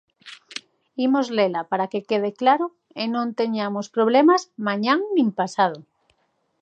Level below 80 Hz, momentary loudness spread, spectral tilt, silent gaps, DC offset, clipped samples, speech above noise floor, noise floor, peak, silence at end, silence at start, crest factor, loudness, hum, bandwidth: -80 dBFS; 15 LU; -5.5 dB/octave; none; under 0.1%; under 0.1%; 48 dB; -69 dBFS; -4 dBFS; 0.8 s; 0.25 s; 18 dB; -22 LUFS; none; 9 kHz